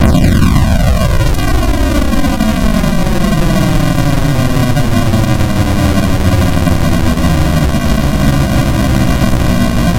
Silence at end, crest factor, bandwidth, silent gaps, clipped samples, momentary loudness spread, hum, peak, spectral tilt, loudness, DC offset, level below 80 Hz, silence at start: 0 s; 8 dB; 16 kHz; none; under 0.1%; 2 LU; none; 0 dBFS; -6 dB/octave; -12 LUFS; under 0.1%; -16 dBFS; 0 s